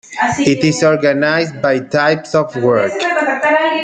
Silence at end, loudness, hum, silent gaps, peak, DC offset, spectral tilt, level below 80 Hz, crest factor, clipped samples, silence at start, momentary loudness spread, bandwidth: 0 s; -14 LUFS; none; none; 0 dBFS; under 0.1%; -5 dB/octave; -54 dBFS; 12 dB; under 0.1%; 0.1 s; 3 LU; 9.4 kHz